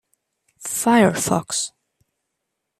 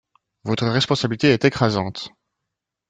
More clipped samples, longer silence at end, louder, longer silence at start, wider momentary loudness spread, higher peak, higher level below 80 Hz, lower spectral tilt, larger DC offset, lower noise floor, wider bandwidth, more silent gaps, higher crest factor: neither; first, 1.1 s vs 0.8 s; about the same, -19 LUFS vs -20 LUFS; first, 0.6 s vs 0.45 s; second, 13 LU vs 17 LU; about the same, -4 dBFS vs -2 dBFS; about the same, -58 dBFS vs -54 dBFS; second, -4 dB/octave vs -5.5 dB/octave; neither; about the same, -79 dBFS vs -82 dBFS; first, 14.5 kHz vs 9.2 kHz; neither; about the same, 20 dB vs 20 dB